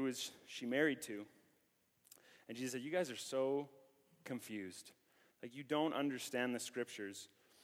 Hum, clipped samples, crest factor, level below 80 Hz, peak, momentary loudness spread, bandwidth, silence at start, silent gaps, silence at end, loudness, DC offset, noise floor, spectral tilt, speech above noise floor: none; under 0.1%; 22 dB; under -90 dBFS; -22 dBFS; 19 LU; 17 kHz; 0 s; none; 0.35 s; -42 LUFS; under 0.1%; -78 dBFS; -3.5 dB/octave; 36 dB